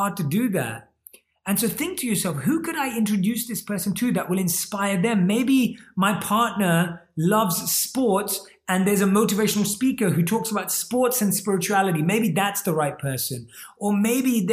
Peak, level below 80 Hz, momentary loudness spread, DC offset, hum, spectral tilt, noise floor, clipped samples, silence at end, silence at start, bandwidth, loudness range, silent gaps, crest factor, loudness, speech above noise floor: -8 dBFS; -60 dBFS; 6 LU; under 0.1%; none; -4.5 dB/octave; -52 dBFS; under 0.1%; 0 s; 0 s; 15.5 kHz; 3 LU; none; 16 dB; -22 LUFS; 30 dB